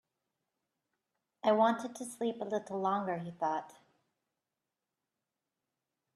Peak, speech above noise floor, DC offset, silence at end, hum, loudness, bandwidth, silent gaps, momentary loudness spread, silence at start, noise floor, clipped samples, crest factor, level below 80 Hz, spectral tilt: -16 dBFS; 56 dB; under 0.1%; 2.45 s; none; -34 LUFS; 14 kHz; none; 10 LU; 1.45 s; -89 dBFS; under 0.1%; 22 dB; -86 dBFS; -5.5 dB/octave